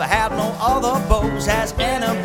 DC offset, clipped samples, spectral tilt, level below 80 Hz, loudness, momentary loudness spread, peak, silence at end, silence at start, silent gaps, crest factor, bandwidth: under 0.1%; under 0.1%; -4.5 dB/octave; -28 dBFS; -19 LUFS; 2 LU; -2 dBFS; 0 s; 0 s; none; 16 dB; 18 kHz